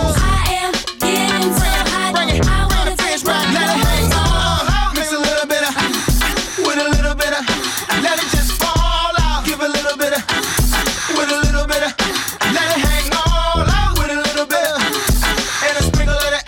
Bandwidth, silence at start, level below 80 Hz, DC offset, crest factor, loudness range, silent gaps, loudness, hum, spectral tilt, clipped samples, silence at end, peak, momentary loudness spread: 17.5 kHz; 0 s; -20 dBFS; under 0.1%; 14 dB; 1 LU; none; -16 LUFS; none; -3.5 dB/octave; under 0.1%; 0 s; -2 dBFS; 3 LU